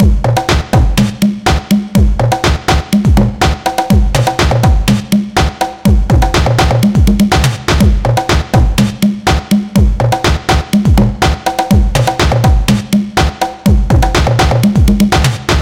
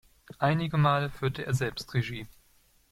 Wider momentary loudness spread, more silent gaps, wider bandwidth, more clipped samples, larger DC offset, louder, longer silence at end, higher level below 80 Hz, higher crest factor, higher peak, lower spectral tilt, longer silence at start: second, 3 LU vs 11 LU; neither; about the same, 17 kHz vs 15.5 kHz; neither; neither; first, -11 LUFS vs -29 LUFS; second, 0 s vs 0.65 s; first, -14 dBFS vs -56 dBFS; second, 10 dB vs 18 dB; first, 0 dBFS vs -10 dBFS; about the same, -5.5 dB/octave vs -6.5 dB/octave; second, 0 s vs 0.4 s